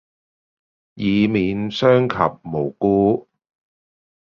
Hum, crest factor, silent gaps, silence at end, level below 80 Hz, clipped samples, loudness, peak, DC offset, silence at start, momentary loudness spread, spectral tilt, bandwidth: none; 20 dB; none; 1.1 s; -50 dBFS; under 0.1%; -19 LUFS; -2 dBFS; under 0.1%; 0.95 s; 9 LU; -8 dB/octave; 7 kHz